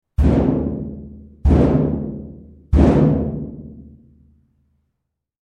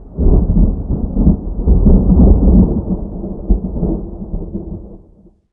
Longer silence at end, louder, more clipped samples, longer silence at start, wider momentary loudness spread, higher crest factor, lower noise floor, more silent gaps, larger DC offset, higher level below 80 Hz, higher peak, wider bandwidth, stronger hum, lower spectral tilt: first, 1.6 s vs 0.55 s; second, -18 LUFS vs -14 LUFS; neither; first, 0.2 s vs 0 s; first, 22 LU vs 16 LU; first, 18 dB vs 12 dB; first, -77 dBFS vs -46 dBFS; neither; neither; second, -24 dBFS vs -14 dBFS; about the same, 0 dBFS vs 0 dBFS; first, 6.4 kHz vs 1.4 kHz; neither; second, -10 dB/octave vs -17 dB/octave